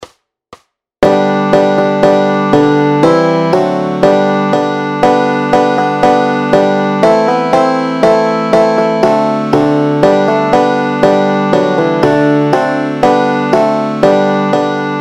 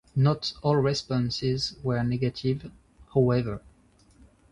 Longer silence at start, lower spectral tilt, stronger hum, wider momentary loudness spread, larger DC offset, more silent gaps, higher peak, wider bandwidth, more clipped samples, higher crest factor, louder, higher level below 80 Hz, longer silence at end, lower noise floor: second, 0 s vs 0.15 s; about the same, -6.5 dB/octave vs -6.5 dB/octave; neither; second, 3 LU vs 9 LU; first, 0.2% vs under 0.1%; neither; first, 0 dBFS vs -10 dBFS; first, 12 kHz vs 10.5 kHz; first, 0.4% vs under 0.1%; second, 10 dB vs 18 dB; first, -10 LUFS vs -27 LUFS; first, -44 dBFS vs -52 dBFS; second, 0 s vs 0.95 s; second, -41 dBFS vs -59 dBFS